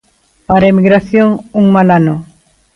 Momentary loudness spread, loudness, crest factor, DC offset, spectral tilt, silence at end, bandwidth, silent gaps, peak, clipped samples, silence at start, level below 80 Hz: 6 LU; -10 LUFS; 10 dB; under 0.1%; -9 dB/octave; 0.5 s; 6 kHz; none; 0 dBFS; under 0.1%; 0.5 s; -40 dBFS